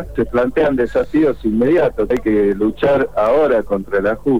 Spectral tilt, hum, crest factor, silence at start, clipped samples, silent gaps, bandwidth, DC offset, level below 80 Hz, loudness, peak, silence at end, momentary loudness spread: -8 dB/octave; none; 8 dB; 0 s; under 0.1%; none; 19.5 kHz; 2%; -36 dBFS; -16 LUFS; -6 dBFS; 0 s; 4 LU